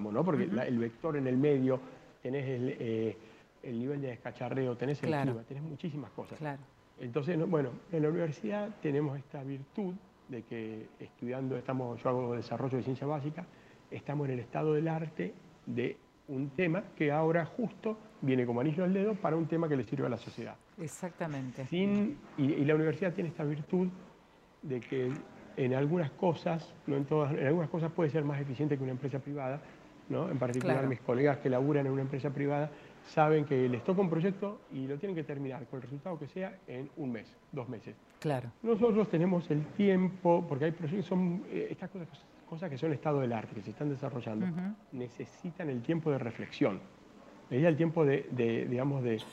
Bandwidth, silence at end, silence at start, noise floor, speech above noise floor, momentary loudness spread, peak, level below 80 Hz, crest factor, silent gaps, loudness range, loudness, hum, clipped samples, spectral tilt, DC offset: 11 kHz; 0 s; 0 s; -61 dBFS; 28 dB; 14 LU; -14 dBFS; -72 dBFS; 20 dB; none; 6 LU; -34 LUFS; none; under 0.1%; -8.5 dB/octave; under 0.1%